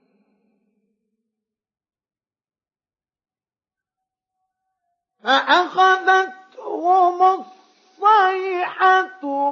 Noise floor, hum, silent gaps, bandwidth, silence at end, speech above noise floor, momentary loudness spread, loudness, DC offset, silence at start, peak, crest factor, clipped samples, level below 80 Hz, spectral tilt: under -90 dBFS; none; none; 7.2 kHz; 0 s; over 73 dB; 13 LU; -17 LUFS; under 0.1%; 5.25 s; -4 dBFS; 18 dB; under 0.1%; -86 dBFS; -2 dB/octave